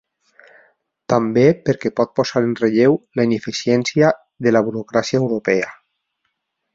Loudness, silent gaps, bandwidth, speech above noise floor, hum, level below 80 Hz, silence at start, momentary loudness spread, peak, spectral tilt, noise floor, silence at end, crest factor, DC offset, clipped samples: -18 LUFS; none; 7.6 kHz; 56 dB; none; -58 dBFS; 1.1 s; 6 LU; -2 dBFS; -6 dB/octave; -73 dBFS; 1 s; 18 dB; under 0.1%; under 0.1%